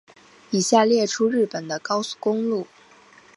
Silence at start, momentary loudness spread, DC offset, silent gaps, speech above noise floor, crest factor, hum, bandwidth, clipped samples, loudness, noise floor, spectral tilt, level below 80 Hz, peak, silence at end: 0.5 s; 11 LU; under 0.1%; none; 30 dB; 20 dB; none; 11.5 kHz; under 0.1%; -22 LUFS; -51 dBFS; -4 dB/octave; -74 dBFS; -4 dBFS; 0.7 s